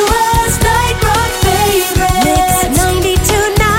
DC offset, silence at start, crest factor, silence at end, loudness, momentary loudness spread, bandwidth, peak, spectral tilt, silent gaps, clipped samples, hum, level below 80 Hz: under 0.1%; 0 s; 10 dB; 0 s; -11 LUFS; 2 LU; 17 kHz; 0 dBFS; -4 dB/octave; none; under 0.1%; none; -20 dBFS